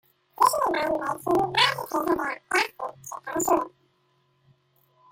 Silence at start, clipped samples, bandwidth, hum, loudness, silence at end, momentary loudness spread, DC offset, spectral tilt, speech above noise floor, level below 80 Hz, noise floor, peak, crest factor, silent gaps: 0.4 s; under 0.1%; 16.5 kHz; none; -25 LUFS; 1.45 s; 13 LU; under 0.1%; -2.5 dB/octave; 42 dB; -62 dBFS; -68 dBFS; -6 dBFS; 20 dB; none